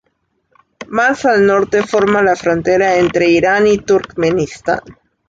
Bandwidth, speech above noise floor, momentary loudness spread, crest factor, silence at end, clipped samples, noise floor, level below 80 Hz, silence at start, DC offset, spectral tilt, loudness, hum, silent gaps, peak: 7.8 kHz; 52 dB; 7 LU; 12 dB; 0.35 s; under 0.1%; -65 dBFS; -46 dBFS; 0.8 s; under 0.1%; -5.5 dB/octave; -13 LUFS; none; none; -2 dBFS